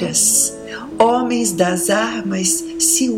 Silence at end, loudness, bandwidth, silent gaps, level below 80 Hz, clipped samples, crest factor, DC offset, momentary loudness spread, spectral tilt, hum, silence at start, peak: 0 s; -15 LUFS; 16.5 kHz; none; -52 dBFS; under 0.1%; 16 dB; under 0.1%; 7 LU; -2.5 dB/octave; none; 0 s; -2 dBFS